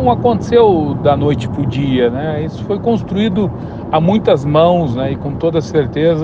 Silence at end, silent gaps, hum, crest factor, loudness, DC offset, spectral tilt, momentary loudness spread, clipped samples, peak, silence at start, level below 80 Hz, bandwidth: 0 s; none; none; 14 dB; -14 LUFS; under 0.1%; -8 dB/octave; 8 LU; under 0.1%; 0 dBFS; 0 s; -36 dBFS; 7.8 kHz